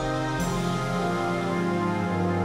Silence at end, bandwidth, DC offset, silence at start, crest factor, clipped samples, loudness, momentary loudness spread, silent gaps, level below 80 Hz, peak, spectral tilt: 0 s; 15 kHz; under 0.1%; 0 s; 12 dB; under 0.1%; -26 LUFS; 1 LU; none; -44 dBFS; -14 dBFS; -6 dB/octave